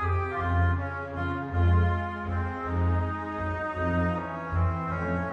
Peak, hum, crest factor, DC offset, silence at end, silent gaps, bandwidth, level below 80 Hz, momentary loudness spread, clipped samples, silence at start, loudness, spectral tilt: -14 dBFS; none; 14 dB; under 0.1%; 0 s; none; 4.3 kHz; -38 dBFS; 7 LU; under 0.1%; 0 s; -29 LUFS; -9 dB/octave